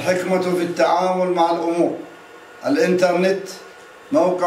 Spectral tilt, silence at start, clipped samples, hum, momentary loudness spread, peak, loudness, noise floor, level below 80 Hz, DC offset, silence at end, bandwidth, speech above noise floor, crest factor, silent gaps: -5.5 dB/octave; 0 s; under 0.1%; none; 13 LU; -4 dBFS; -19 LUFS; -41 dBFS; -70 dBFS; under 0.1%; 0 s; 15.5 kHz; 23 dB; 16 dB; none